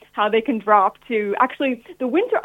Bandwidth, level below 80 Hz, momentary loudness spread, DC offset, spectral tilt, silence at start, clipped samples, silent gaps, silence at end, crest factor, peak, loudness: 4 kHz; -66 dBFS; 7 LU; under 0.1%; -6.5 dB/octave; 0.15 s; under 0.1%; none; 0 s; 18 dB; -2 dBFS; -20 LUFS